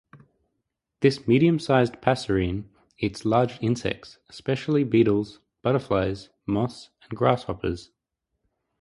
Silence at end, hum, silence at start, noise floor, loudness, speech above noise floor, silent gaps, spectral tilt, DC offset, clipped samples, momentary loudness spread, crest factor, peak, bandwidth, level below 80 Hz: 0.95 s; none; 0.15 s; -81 dBFS; -24 LUFS; 57 dB; none; -7 dB/octave; under 0.1%; under 0.1%; 14 LU; 24 dB; -2 dBFS; 11.5 kHz; -48 dBFS